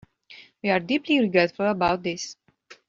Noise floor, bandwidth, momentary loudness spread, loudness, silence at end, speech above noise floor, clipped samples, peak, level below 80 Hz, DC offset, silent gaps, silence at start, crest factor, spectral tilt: -50 dBFS; 7.6 kHz; 10 LU; -23 LUFS; 0.15 s; 27 dB; under 0.1%; -6 dBFS; -58 dBFS; under 0.1%; none; 0.3 s; 20 dB; -3.5 dB/octave